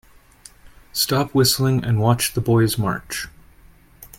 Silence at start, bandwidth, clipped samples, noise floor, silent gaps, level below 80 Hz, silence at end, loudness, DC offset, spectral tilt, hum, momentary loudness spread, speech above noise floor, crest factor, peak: 0.65 s; 17 kHz; under 0.1%; -49 dBFS; none; -46 dBFS; 0.1 s; -19 LUFS; under 0.1%; -4.5 dB/octave; none; 12 LU; 31 dB; 18 dB; -2 dBFS